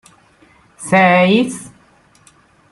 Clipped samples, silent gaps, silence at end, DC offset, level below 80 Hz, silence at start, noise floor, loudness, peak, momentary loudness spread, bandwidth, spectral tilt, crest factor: under 0.1%; none; 1.05 s; under 0.1%; -58 dBFS; 0.8 s; -51 dBFS; -13 LUFS; -2 dBFS; 21 LU; 12 kHz; -5.5 dB/octave; 16 dB